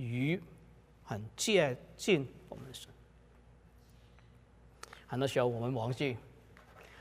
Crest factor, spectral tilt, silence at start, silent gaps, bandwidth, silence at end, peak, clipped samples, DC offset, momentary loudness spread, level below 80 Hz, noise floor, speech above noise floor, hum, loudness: 22 dB; -5 dB/octave; 0 s; none; 15.5 kHz; 0 s; -16 dBFS; under 0.1%; under 0.1%; 23 LU; -64 dBFS; -60 dBFS; 27 dB; none; -34 LUFS